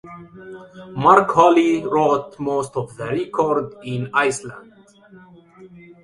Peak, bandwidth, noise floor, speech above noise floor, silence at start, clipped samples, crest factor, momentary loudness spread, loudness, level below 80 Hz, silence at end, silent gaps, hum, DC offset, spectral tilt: 0 dBFS; 11.5 kHz; -47 dBFS; 28 dB; 0.05 s; under 0.1%; 20 dB; 25 LU; -18 LUFS; -58 dBFS; 0.4 s; none; none; under 0.1%; -5.5 dB/octave